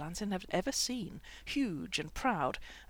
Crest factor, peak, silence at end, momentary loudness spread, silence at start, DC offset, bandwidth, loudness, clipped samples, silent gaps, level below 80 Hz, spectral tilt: 18 dB; -18 dBFS; 0.05 s; 7 LU; 0 s; under 0.1%; 19.5 kHz; -35 LUFS; under 0.1%; none; -54 dBFS; -3.5 dB/octave